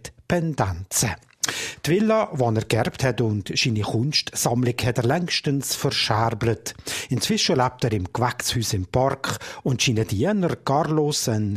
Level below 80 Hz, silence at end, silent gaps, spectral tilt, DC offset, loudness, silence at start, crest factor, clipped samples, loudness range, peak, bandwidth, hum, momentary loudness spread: -48 dBFS; 0 s; none; -4.5 dB/octave; under 0.1%; -23 LUFS; 0.05 s; 20 dB; under 0.1%; 1 LU; -4 dBFS; 15.5 kHz; none; 6 LU